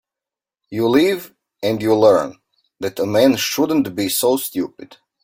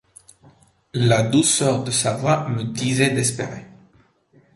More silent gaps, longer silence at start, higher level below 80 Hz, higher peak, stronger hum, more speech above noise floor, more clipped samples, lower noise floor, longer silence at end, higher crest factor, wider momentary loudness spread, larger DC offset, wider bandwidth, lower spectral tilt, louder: neither; second, 0.7 s vs 0.95 s; about the same, -60 dBFS vs -56 dBFS; about the same, -2 dBFS vs -4 dBFS; neither; first, 71 dB vs 38 dB; neither; first, -88 dBFS vs -57 dBFS; second, 0.4 s vs 0.9 s; about the same, 18 dB vs 18 dB; about the same, 13 LU vs 13 LU; neither; first, 16.5 kHz vs 12 kHz; about the same, -4.5 dB/octave vs -4.5 dB/octave; first, -17 LUFS vs -20 LUFS